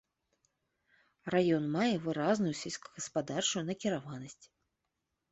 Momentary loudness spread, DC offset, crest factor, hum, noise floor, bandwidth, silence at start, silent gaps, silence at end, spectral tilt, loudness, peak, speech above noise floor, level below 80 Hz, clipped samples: 14 LU; under 0.1%; 18 dB; none; -85 dBFS; 8.2 kHz; 1.25 s; none; 0.85 s; -4.5 dB/octave; -33 LUFS; -16 dBFS; 52 dB; -74 dBFS; under 0.1%